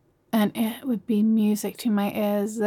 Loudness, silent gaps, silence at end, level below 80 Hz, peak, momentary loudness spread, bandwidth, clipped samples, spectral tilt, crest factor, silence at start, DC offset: -24 LUFS; none; 0 s; -72 dBFS; -12 dBFS; 6 LU; 17.5 kHz; under 0.1%; -6 dB/octave; 12 dB; 0.35 s; under 0.1%